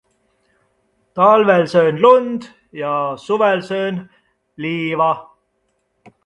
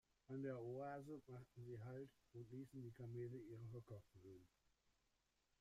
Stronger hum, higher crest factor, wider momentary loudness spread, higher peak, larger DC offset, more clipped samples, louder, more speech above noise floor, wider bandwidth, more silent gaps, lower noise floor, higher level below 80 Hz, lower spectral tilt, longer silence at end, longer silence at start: neither; about the same, 18 dB vs 16 dB; first, 16 LU vs 11 LU; first, 0 dBFS vs -40 dBFS; neither; neither; first, -16 LUFS vs -56 LUFS; first, 52 dB vs 32 dB; second, 9.6 kHz vs 15 kHz; neither; second, -67 dBFS vs -86 dBFS; first, -64 dBFS vs -82 dBFS; second, -6.5 dB/octave vs -8.5 dB/octave; about the same, 1.05 s vs 1.15 s; first, 1.15 s vs 0.3 s